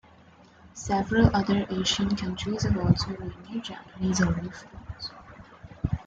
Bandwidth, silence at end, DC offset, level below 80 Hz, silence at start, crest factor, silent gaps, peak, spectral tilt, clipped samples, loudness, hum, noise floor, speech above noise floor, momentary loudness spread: 9 kHz; 0.05 s; under 0.1%; -44 dBFS; 0.65 s; 22 dB; none; -6 dBFS; -5.5 dB/octave; under 0.1%; -27 LUFS; none; -54 dBFS; 28 dB; 21 LU